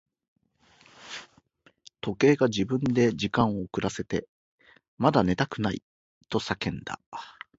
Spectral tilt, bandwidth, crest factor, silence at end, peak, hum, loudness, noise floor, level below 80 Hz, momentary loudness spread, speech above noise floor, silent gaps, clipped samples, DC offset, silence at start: -6 dB/octave; 8 kHz; 24 dB; 0.25 s; -6 dBFS; none; -27 LUFS; -62 dBFS; -54 dBFS; 18 LU; 37 dB; 4.29-4.58 s, 4.88-4.97 s, 5.83-6.21 s, 7.06-7.12 s; under 0.1%; under 0.1%; 1 s